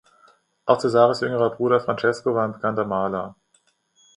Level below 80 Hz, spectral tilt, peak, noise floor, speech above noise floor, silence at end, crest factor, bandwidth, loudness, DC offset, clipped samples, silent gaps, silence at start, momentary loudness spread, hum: -62 dBFS; -6.5 dB/octave; -2 dBFS; -65 dBFS; 44 dB; 0.85 s; 20 dB; 11 kHz; -22 LUFS; under 0.1%; under 0.1%; none; 0.65 s; 9 LU; none